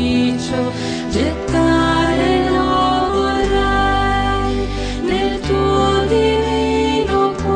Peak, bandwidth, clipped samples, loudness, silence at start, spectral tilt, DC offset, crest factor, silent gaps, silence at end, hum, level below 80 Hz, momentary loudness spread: -4 dBFS; 10 kHz; under 0.1%; -16 LUFS; 0 s; -5.5 dB/octave; under 0.1%; 12 dB; none; 0 s; none; -28 dBFS; 5 LU